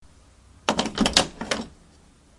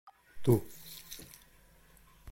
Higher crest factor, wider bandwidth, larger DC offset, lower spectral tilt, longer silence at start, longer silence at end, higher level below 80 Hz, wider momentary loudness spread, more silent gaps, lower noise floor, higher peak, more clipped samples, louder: first, 28 dB vs 22 dB; second, 11.5 kHz vs 17 kHz; neither; second, -2.5 dB/octave vs -7 dB/octave; first, 0.65 s vs 0.05 s; first, 0.65 s vs 0 s; first, -46 dBFS vs -60 dBFS; second, 10 LU vs 22 LU; neither; second, -54 dBFS vs -62 dBFS; first, 0 dBFS vs -14 dBFS; neither; first, -24 LUFS vs -33 LUFS